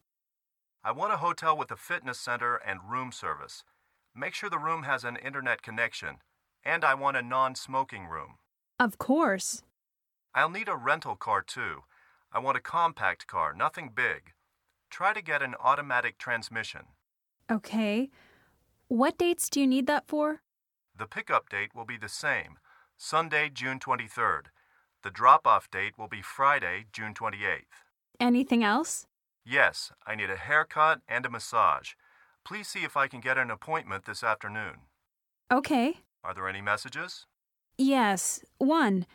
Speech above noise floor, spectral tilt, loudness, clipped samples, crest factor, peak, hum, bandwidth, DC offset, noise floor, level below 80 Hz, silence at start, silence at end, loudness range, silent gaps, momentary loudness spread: 59 dB; -3.5 dB/octave; -29 LUFS; under 0.1%; 24 dB; -6 dBFS; none; 18.5 kHz; under 0.1%; -88 dBFS; -70 dBFS; 0.85 s; 0.1 s; 5 LU; none; 14 LU